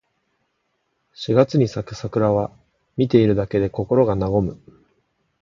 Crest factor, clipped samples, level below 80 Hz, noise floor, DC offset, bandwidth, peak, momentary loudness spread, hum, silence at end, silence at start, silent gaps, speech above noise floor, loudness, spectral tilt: 20 dB; under 0.1%; -46 dBFS; -71 dBFS; under 0.1%; 7.4 kHz; -2 dBFS; 12 LU; none; 0.85 s; 1.2 s; none; 52 dB; -20 LUFS; -8 dB/octave